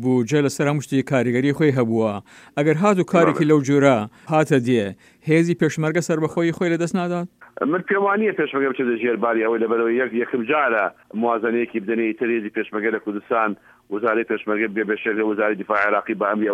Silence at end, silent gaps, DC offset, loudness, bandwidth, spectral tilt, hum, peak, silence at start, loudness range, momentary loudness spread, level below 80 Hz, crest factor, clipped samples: 0 s; none; under 0.1%; -20 LUFS; 15 kHz; -6.5 dB/octave; none; -2 dBFS; 0 s; 4 LU; 7 LU; -68 dBFS; 18 dB; under 0.1%